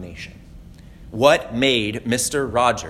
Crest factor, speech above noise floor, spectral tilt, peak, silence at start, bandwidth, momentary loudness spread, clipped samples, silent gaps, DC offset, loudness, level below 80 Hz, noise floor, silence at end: 20 dB; 22 dB; -3.5 dB/octave; 0 dBFS; 0 s; 16 kHz; 19 LU; under 0.1%; none; under 0.1%; -19 LUFS; -44 dBFS; -42 dBFS; 0 s